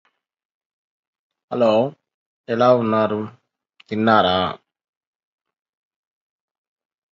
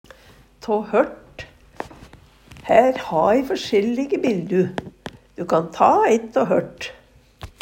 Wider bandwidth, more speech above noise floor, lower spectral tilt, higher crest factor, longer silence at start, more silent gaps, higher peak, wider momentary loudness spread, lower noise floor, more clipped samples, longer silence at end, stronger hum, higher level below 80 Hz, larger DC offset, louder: second, 7.4 kHz vs 16 kHz; first, 39 dB vs 31 dB; about the same, -7 dB/octave vs -6 dB/octave; about the same, 22 dB vs 20 dB; first, 1.5 s vs 0.65 s; first, 2.14-2.44 s vs none; about the same, -2 dBFS vs 0 dBFS; second, 14 LU vs 22 LU; first, -56 dBFS vs -50 dBFS; neither; first, 2.55 s vs 0.15 s; neither; about the same, -56 dBFS vs -52 dBFS; neither; about the same, -19 LUFS vs -19 LUFS